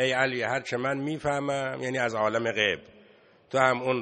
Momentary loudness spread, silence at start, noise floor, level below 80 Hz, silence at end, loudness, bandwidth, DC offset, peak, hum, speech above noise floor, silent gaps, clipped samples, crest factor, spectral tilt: 6 LU; 0 s; -57 dBFS; -64 dBFS; 0 s; -27 LUFS; 9.4 kHz; under 0.1%; -6 dBFS; none; 30 dB; none; under 0.1%; 22 dB; -4.5 dB/octave